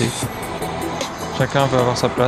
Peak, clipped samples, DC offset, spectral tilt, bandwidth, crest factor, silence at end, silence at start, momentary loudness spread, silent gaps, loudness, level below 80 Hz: 0 dBFS; under 0.1%; under 0.1%; -5 dB/octave; 16 kHz; 20 dB; 0 s; 0 s; 9 LU; none; -21 LUFS; -42 dBFS